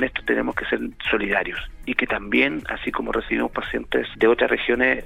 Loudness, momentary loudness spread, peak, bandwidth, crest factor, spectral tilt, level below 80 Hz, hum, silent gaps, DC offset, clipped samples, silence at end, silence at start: -22 LUFS; 8 LU; -2 dBFS; 14.5 kHz; 22 dB; -6 dB/octave; -42 dBFS; none; none; under 0.1%; under 0.1%; 0 s; 0 s